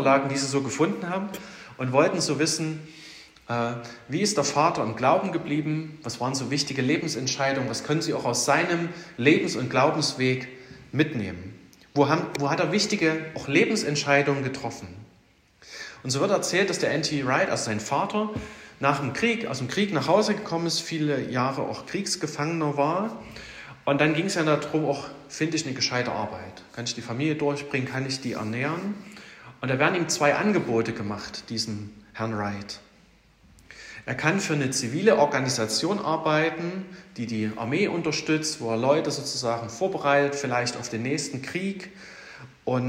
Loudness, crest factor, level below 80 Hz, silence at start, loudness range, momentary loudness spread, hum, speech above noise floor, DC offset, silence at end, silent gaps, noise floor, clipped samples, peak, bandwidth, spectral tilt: -25 LUFS; 22 dB; -64 dBFS; 0 s; 4 LU; 15 LU; none; 34 dB; under 0.1%; 0 s; none; -59 dBFS; under 0.1%; -4 dBFS; 16 kHz; -4.5 dB/octave